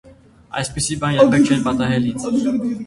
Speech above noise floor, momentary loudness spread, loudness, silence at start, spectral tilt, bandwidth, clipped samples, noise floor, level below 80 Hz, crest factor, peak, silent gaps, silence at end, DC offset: 27 dB; 11 LU; -18 LUFS; 0.05 s; -5.5 dB/octave; 11.5 kHz; under 0.1%; -44 dBFS; -44 dBFS; 18 dB; 0 dBFS; none; 0 s; under 0.1%